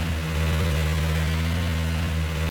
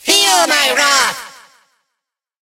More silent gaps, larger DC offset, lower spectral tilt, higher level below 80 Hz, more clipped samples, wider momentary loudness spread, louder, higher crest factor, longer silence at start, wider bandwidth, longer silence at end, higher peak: neither; neither; first, -5.5 dB/octave vs 1 dB/octave; first, -32 dBFS vs -56 dBFS; neither; second, 2 LU vs 8 LU; second, -25 LUFS vs -11 LUFS; second, 10 dB vs 16 dB; about the same, 0 s vs 0.05 s; first, 19 kHz vs 16 kHz; second, 0 s vs 1.1 s; second, -14 dBFS vs 0 dBFS